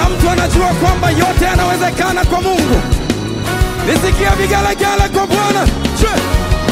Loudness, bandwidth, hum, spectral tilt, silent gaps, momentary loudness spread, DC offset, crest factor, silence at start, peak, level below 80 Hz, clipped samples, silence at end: -13 LUFS; 16 kHz; none; -5 dB/octave; none; 4 LU; under 0.1%; 12 dB; 0 s; 0 dBFS; -18 dBFS; under 0.1%; 0 s